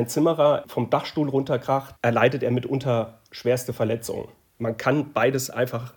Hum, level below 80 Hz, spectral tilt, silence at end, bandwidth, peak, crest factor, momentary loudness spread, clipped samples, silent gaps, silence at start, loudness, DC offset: none; -62 dBFS; -6 dB/octave; 0.05 s; 18 kHz; -6 dBFS; 18 dB; 9 LU; under 0.1%; none; 0 s; -24 LUFS; under 0.1%